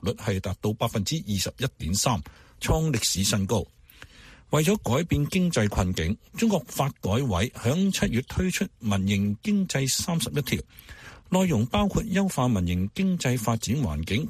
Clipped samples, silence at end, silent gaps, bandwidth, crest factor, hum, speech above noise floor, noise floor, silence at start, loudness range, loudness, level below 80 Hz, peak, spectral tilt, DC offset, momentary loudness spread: under 0.1%; 0 s; none; 15.5 kHz; 16 dB; none; 24 dB; -50 dBFS; 0 s; 1 LU; -26 LUFS; -42 dBFS; -10 dBFS; -5 dB/octave; under 0.1%; 6 LU